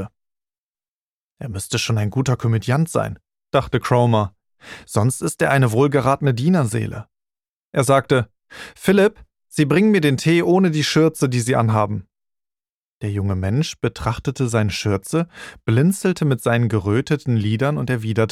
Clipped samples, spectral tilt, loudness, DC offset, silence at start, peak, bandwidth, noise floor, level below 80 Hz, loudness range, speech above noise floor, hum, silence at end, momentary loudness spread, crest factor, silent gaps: under 0.1%; -6 dB/octave; -19 LUFS; under 0.1%; 0 s; -2 dBFS; 15 kHz; under -90 dBFS; -48 dBFS; 5 LU; over 72 dB; none; 0.05 s; 13 LU; 18 dB; 0.58-0.75 s, 0.88-1.36 s, 7.49-7.72 s, 12.69-13.00 s